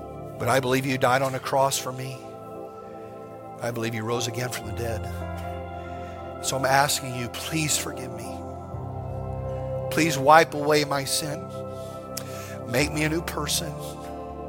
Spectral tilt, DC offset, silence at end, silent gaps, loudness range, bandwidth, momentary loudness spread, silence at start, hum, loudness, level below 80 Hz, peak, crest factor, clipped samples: -4 dB/octave; under 0.1%; 0 s; none; 8 LU; 17 kHz; 15 LU; 0 s; none; -26 LUFS; -48 dBFS; -2 dBFS; 24 dB; under 0.1%